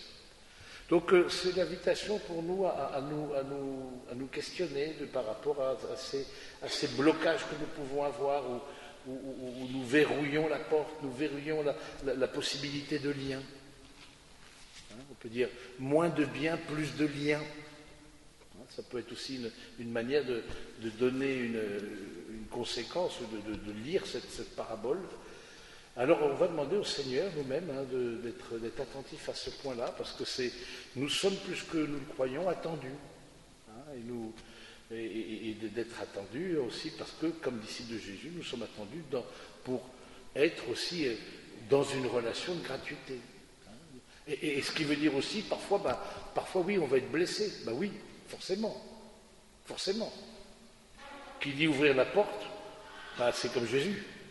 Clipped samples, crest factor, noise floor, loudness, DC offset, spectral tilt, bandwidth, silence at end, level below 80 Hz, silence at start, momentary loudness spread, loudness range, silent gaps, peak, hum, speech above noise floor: under 0.1%; 22 dB; -58 dBFS; -34 LUFS; under 0.1%; -4.5 dB/octave; 11.5 kHz; 0 s; -62 dBFS; 0 s; 19 LU; 7 LU; none; -14 dBFS; none; 24 dB